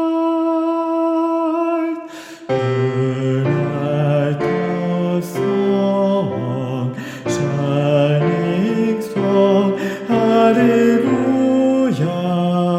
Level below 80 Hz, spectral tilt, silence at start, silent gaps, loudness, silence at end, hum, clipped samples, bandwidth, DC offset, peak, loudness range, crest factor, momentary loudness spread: -58 dBFS; -7.5 dB/octave; 0 s; none; -17 LUFS; 0 s; none; under 0.1%; 16 kHz; under 0.1%; -2 dBFS; 4 LU; 14 dB; 8 LU